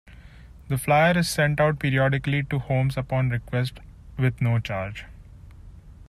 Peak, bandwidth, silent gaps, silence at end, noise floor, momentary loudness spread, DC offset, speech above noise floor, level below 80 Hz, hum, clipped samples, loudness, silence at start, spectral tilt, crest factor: -8 dBFS; 14.5 kHz; none; 0.05 s; -46 dBFS; 11 LU; under 0.1%; 23 dB; -46 dBFS; none; under 0.1%; -24 LUFS; 0.05 s; -6 dB/octave; 18 dB